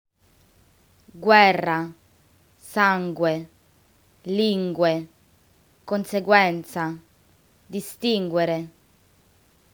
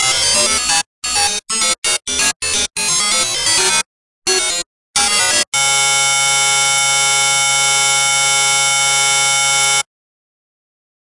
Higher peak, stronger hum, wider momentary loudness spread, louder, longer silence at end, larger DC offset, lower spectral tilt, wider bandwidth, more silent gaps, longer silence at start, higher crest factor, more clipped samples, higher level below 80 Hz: about the same, 0 dBFS vs 0 dBFS; neither; first, 17 LU vs 5 LU; second, -22 LUFS vs -12 LUFS; second, 1.05 s vs 1.25 s; second, under 0.1% vs 0.2%; first, -5.5 dB/octave vs 1 dB/octave; first, over 20 kHz vs 12 kHz; second, none vs 0.86-1.02 s, 1.78-1.82 s, 2.36-2.40 s, 3.86-4.22 s, 4.66-4.93 s, 5.47-5.52 s; first, 1.15 s vs 0 s; first, 24 dB vs 14 dB; neither; second, -68 dBFS vs -48 dBFS